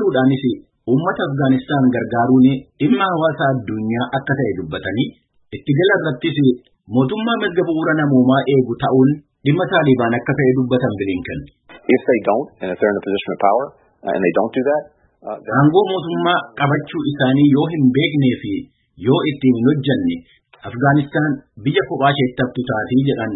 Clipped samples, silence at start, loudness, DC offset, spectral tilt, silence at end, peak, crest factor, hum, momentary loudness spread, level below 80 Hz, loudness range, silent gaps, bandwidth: under 0.1%; 0 s; -17 LUFS; under 0.1%; -12.5 dB/octave; 0 s; -2 dBFS; 16 dB; none; 10 LU; -52 dBFS; 3 LU; none; 4 kHz